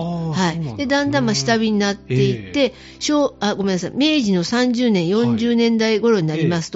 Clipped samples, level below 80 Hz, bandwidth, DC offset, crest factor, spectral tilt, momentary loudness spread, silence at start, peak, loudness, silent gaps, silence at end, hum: under 0.1%; -50 dBFS; 8 kHz; under 0.1%; 14 dB; -5 dB/octave; 5 LU; 0 s; -4 dBFS; -18 LUFS; none; 0 s; none